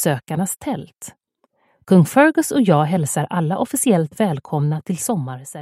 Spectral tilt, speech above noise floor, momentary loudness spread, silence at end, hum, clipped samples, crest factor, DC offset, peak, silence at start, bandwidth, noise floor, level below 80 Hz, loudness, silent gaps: -6 dB/octave; 46 dB; 14 LU; 0 s; none; under 0.1%; 18 dB; under 0.1%; 0 dBFS; 0 s; 15.5 kHz; -65 dBFS; -60 dBFS; -18 LUFS; none